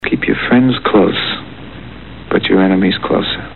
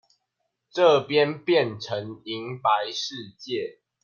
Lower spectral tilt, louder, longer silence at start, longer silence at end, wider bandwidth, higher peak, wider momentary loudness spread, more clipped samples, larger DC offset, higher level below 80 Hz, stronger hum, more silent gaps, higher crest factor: first, -10 dB/octave vs -5 dB/octave; first, -13 LUFS vs -25 LUFS; second, 0 s vs 0.75 s; second, 0 s vs 0.3 s; second, 4.3 kHz vs 7 kHz; first, -2 dBFS vs -6 dBFS; first, 20 LU vs 14 LU; neither; first, 1% vs under 0.1%; first, -40 dBFS vs -74 dBFS; neither; neither; second, 12 dB vs 18 dB